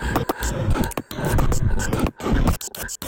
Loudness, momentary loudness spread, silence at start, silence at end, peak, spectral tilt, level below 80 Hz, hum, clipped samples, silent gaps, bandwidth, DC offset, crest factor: -24 LUFS; 5 LU; 0 s; 0 s; -8 dBFS; -5.5 dB/octave; -26 dBFS; none; under 0.1%; none; 17 kHz; 1%; 12 dB